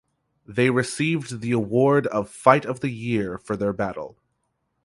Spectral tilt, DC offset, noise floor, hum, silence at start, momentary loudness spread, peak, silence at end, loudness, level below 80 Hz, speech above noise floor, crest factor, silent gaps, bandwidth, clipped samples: -6 dB/octave; under 0.1%; -74 dBFS; none; 0.5 s; 10 LU; 0 dBFS; 0.75 s; -23 LUFS; -56 dBFS; 52 dB; 22 dB; none; 11.5 kHz; under 0.1%